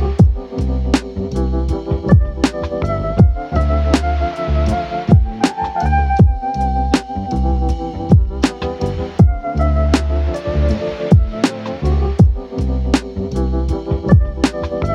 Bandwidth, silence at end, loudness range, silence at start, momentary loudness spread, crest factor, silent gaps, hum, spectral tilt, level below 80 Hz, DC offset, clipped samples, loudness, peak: 10.5 kHz; 0 s; 1 LU; 0 s; 7 LU; 14 dB; none; none; -7.5 dB/octave; -20 dBFS; under 0.1%; under 0.1%; -17 LUFS; 0 dBFS